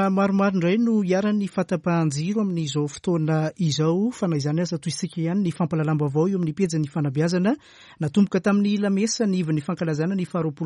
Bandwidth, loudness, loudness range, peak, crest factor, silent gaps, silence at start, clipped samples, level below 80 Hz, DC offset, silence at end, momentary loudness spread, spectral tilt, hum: 11 kHz; -23 LUFS; 1 LU; -10 dBFS; 14 dB; none; 0 s; under 0.1%; -62 dBFS; under 0.1%; 0 s; 5 LU; -6.5 dB/octave; none